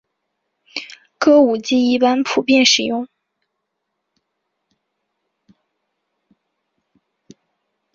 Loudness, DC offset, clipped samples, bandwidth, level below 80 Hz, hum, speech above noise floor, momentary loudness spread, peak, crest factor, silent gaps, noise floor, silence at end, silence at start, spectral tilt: -15 LUFS; under 0.1%; under 0.1%; 7.6 kHz; -66 dBFS; none; 62 dB; 18 LU; -2 dBFS; 20 dB; none; -76 dBFS; 4.9 s; 0.75 s; -2.5 dB/octave